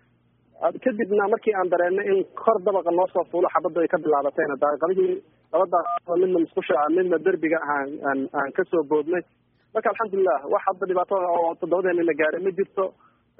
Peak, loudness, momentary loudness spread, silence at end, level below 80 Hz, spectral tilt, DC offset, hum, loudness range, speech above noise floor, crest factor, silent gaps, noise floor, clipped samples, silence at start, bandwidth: -6 dBFS; -23 LUFS; 5 LU; 0.5 s; -72 dBFS; -0.5 dB/octave; under 0.1%; none; 2 LU; 40 dB; 18 dB; none; -62 dBFS; under 0.1%; 0.6 s; 3.7 kHz